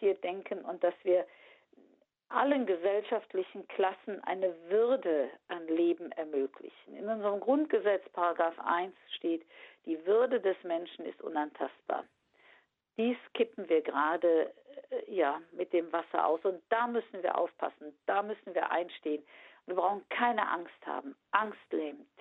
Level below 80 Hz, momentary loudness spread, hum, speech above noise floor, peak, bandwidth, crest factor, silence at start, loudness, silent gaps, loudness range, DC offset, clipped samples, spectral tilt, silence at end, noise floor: -88 dBFS; 11 LU; none; 34 dB; -10 dBFS; 4.1 kHz; 22 dB; 0 s; -33 LUFS; none; 3 LU; under 0.1%; under 0.1%; -7.5 dB/octave; 0.2 s; -67 dBFS